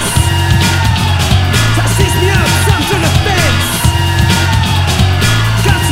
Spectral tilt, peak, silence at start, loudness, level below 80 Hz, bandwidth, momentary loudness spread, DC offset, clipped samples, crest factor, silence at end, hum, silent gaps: -4 dB/octave; 0 dBFS; 0 s; -11 LUFS; -20 dBFS; 16.5 kHz; 1 LU; under 0.1%; 0.3%; 10 dB; 0 s; none; none